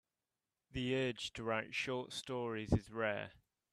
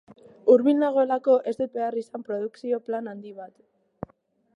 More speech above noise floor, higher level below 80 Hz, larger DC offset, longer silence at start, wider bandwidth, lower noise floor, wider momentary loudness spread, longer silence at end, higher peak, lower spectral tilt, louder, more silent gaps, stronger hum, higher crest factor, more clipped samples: first, over 51 dB vs 39 dB; first, -58 dBFS vs -68 dBFS; neither; first, 0.75 s vs 0.45 s; first, 13.5 kHz vs 7 kHz; first, under -90 dBFS vs -63 dBFS; second, 6 LU vs 23 LU; second, 0.4 s vs 1.1 s; second, -20 dBFS vs -6 dBFS; second, -5.5 dB/octave vs -7.5 dB/octave; second, -40 LUFS vs -24 LUFS; neither; neither; about the same, 22 dB vs 20 dB; neither